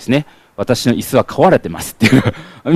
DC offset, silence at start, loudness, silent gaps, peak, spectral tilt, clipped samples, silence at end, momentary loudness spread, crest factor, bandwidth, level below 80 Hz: under 0.1%; 0 s; -14 LUFS; none; 0 dBFS; -5.5 dB/octave; under 0.1%; 0 s; 13 LU; 14 dB; 15.5 kHz; -42 dBFS